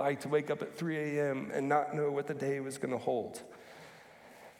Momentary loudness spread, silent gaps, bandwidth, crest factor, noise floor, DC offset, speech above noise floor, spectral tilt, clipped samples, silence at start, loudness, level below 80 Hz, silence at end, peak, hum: 21 LU; none; 16 kHz; 18 dB; -56 dBFS; under 0.1%; 21 dB; -6 dB/octave; under 0.1%; 0 s; -34 LUFS; -82 dBFS; 0.05 s; -18 dBFS; none